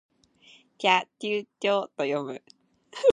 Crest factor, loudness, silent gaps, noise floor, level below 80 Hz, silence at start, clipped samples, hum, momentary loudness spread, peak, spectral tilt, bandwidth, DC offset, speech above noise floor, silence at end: 22 dB; -27 LUFS; none; -58 dBFS; -84 dBFS; 0.8 s; under 0.1%; none; 15 LU; -6 dBFS; -4 dB/octave; 11 kHz; under 0.1%; 30 dB; 0 s